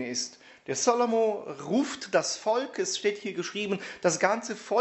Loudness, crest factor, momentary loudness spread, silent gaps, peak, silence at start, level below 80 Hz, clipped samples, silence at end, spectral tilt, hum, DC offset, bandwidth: -28 LUFS; 20 dB; 9 LU; none; -8 dBFS; 0 s; -74 dBFS; under 0.1%; 0 s; -3 dB/octave; none; under 0.1%; 8.2 kHz